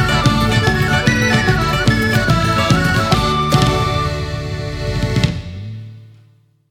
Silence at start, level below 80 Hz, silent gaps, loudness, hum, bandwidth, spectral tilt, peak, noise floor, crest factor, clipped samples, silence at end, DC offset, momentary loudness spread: 0 s; -28 dBFS; none; -15 LUFS; none; 17.5 kHz; -5 dB/octave; 0 dBFS; -51 dBFS; 16 dB; under 0.1%; 0.65 s; under 0.1%; 10 LU